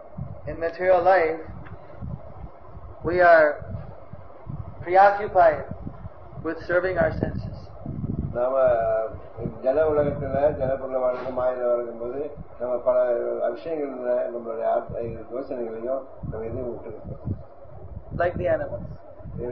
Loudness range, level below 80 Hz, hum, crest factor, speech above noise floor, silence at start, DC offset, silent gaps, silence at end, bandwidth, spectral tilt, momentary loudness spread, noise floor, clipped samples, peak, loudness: 9 LU; -46 dBFS; none; 20 dB; 21 dB; 0 s; 0.8%; none; 0 s; 5.8 kHz; -9.5 dB/octave; 21 LU; -44 dBFS; under 0.1%; -4 dBFS; -24 LUFS